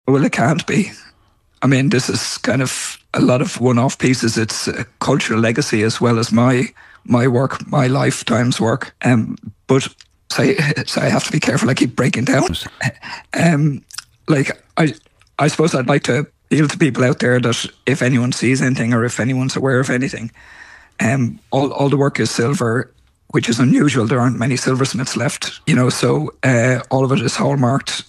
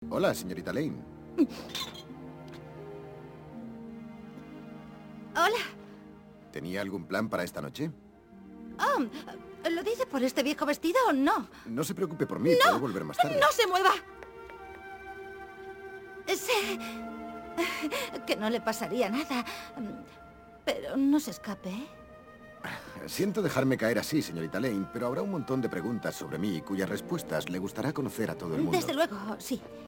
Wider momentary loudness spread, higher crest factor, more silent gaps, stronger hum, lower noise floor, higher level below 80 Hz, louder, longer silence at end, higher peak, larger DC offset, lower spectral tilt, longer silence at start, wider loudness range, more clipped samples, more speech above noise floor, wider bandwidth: second, 7 LU vs 20 LU; second, 16 dB vs 22 dB; neither; neither; first, -56 dBFS vs -51 dBFS; first, -50 dBFS vs -64 dBFS; first, -17 LUFS vs -31 LUFS; about the same, 0.05 s vs 0 s; first, 0 dBFS vs -10 dBFS; neither; about the same, -5.5 dB/octave vs -4.5 dB/octave; about the same, 0.05 s vs 0 s; second, 2 LU vs 9 LU; neither; first, 40 dB vs 21 dB; second, 13 kHz vs 17 kHz